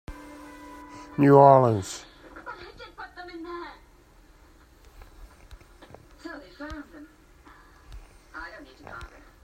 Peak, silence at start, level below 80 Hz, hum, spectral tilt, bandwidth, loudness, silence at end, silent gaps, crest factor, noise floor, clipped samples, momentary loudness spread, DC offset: -2 dBFS; 0.1 s; -52 dBFS; none; -7.5 dB/octave; 15 kHz; -19 LUFS; 0.4 s; none; 26 dB; -55 dBFS; under 0.1%; 28 LU; under 0.1%